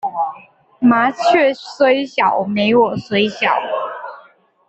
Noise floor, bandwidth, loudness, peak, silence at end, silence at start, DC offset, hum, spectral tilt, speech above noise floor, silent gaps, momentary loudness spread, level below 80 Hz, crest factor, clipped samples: -48 dBFS; 8.2 kHz; -16 LUFS; -2 dBFS; 0.5 s; 0.05 s; under 0.1%; none; -5.5 dB/octave; 33 dB; none; 10 LU; -60 dBFS; 14 dB; under 0.1%